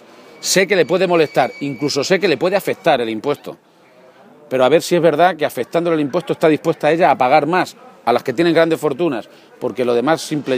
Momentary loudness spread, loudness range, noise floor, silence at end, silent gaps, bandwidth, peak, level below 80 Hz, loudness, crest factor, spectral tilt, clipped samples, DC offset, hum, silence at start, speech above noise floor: 9 LU; 3 LU; -47 dBFS; 0 s; none; 15.5 kHz; 0 dBFS; -68 dBFS; -16 LUFS; 16 dB; -4.5 dB/octave; under 0.1%; under 0.1%; none; 0.4 s; 31 dB